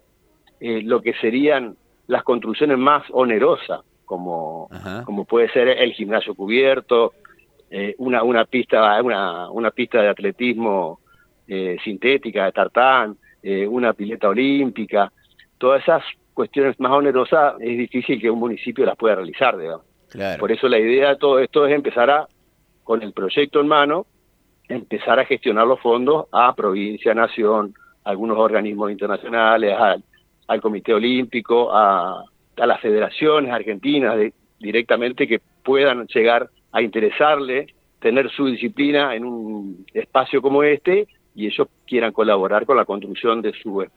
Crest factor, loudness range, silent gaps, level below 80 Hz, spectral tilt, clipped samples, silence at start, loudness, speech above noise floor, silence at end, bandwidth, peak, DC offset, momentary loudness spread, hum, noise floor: 18 dB; 2 LU; none; -64 dBFS; -7 dB/octave; under 0.1%; 0.6 s; -19 LUFS; 43 dB; 0.1 s; 4.7 kHz; 0 dBFS; under 0.1%; 12 LU; none; -61 dBFS